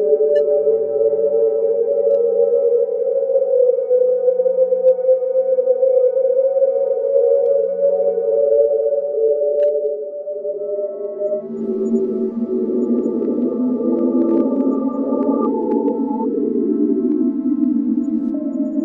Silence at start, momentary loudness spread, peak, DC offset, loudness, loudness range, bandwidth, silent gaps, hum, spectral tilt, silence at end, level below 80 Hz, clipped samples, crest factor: 0 s; 7 LU; -4 dBFS; under 0.1%; -17 LUFS; 5 LU; 3.1 kHz; none; none; -10.5 dB/octave; 0 s; -66 dBFS; under 0.1%; 12 dB